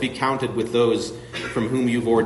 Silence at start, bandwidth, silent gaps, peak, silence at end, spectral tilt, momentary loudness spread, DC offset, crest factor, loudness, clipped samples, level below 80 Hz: 0 s; 11.5 kHz; none; -8 dBFS; 0 s; -5.5 dB/octave; 8 LU; under 0.1%; 14 dB; -23 LUFS; under 0.1%; -52 dBFS